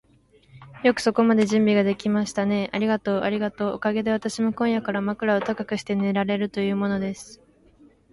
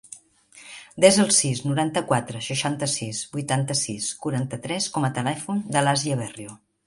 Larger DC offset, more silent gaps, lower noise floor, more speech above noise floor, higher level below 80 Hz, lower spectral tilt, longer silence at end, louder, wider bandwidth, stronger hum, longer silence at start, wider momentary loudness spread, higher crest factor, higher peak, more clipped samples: neither; neither; first, -58 dBFS vs -51 dBFS; first, 35 dB vs 28 dB; about the same, -60 dBFS vs -62 dBFS; first, -6 dB/octave vs -4 dB/octave; first, 0.75 s vs 0.3 s; about the same, -23 LUFS vs -23 LUFS; about the same, 11.5 kHz vs 11.5 kHz; neither; first, 0.55 s vs 0.1 s; second, 7 LU vs 21 LU; second, 16 dB vs 22 dB; second, -6 dBFS vs -2 dBFS; neither